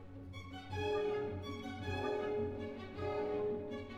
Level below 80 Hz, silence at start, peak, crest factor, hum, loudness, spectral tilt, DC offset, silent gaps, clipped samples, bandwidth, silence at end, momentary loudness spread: -62 dBFS; 0 s; -26 dBFS; 14 dB; none; -40 LUFS; -6.5 dB/octave; under 0.1%; none; under 0.1%; 9.8 kHz; 0 s; 10 LU